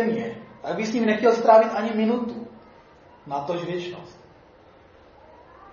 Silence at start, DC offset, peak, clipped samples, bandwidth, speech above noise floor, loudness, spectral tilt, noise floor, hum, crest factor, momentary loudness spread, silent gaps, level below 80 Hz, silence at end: 0 s; under 0.1%; -4 dBFS; under 0.1%; 7.2 kHz; 30 dB; -22 LUFS; -6 dB/octave; -52 dBFS; none; 20 dB; 20 LU; none; -64 dBFS; 1.6 s